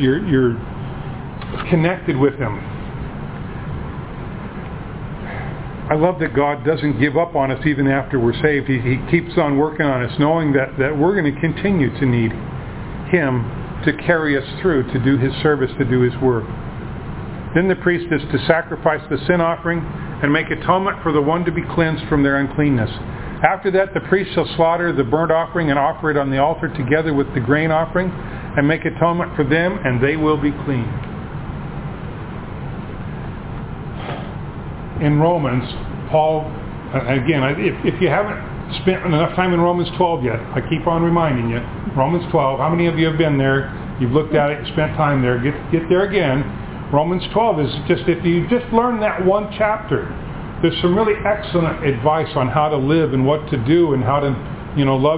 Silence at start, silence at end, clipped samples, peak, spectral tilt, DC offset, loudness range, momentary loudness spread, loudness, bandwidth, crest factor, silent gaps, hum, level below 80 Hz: 0 s; 0 s; under 0.1%; 0 dBFS; -11 dB/octave; under 0.1%; 5 LU; 13 LU; -18 LUFS; 4 kHz; 18 dB; none; none; -36 dBFS